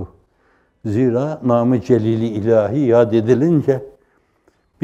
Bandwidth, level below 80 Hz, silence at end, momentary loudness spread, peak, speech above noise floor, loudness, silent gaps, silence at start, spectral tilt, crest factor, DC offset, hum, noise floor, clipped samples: 8.2 kHz; -56 dBFS; 0.95 s; 8 LU; -2 dBFS; 44 dB; -16 LUFS; none; 0 s; -9 dB/octave; 16 dB; under 0.1%; none; -60 dBFS; under 0.1%